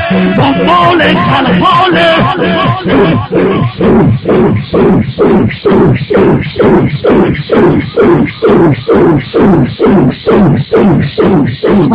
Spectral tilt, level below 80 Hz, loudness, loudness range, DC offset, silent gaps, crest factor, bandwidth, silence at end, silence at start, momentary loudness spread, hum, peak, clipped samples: -9 dB/octave; -30 dBFS; -8 LUFS; 1 LU; under 0.1%; none; 6 dB; 7.6 kHz; 0 s; 0 s; 3 LU; none; 0 dBFS; under 0.1%